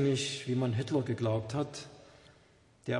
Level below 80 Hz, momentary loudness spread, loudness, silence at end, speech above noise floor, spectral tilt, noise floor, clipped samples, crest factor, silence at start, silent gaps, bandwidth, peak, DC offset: -68 dBFS; 14 LU; -33 LUFS; 0 s; 31 dB; -5.5 dB/octave; -63 dBFS; under 0.1%; 16 dB; 0 s; none; 11.5 kHz; -18 dBFS; under 0.1%